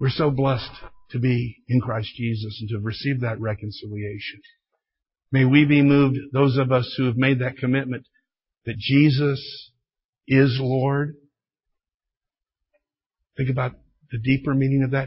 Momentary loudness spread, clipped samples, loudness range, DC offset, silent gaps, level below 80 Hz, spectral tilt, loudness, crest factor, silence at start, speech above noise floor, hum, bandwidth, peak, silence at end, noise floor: 15 LU; under 0.1%; 9 LU; under 0.1%; 10.05-10.13 s, 11.94-12.00 s, 13.06-13.10 s; -52 dBFS; -11.5 dB/octave; -22 LUFS; 20 dB; 0 s; 67 dB; none; 5.8 kHz; -2 dBFS; 0 s; -88 dBFS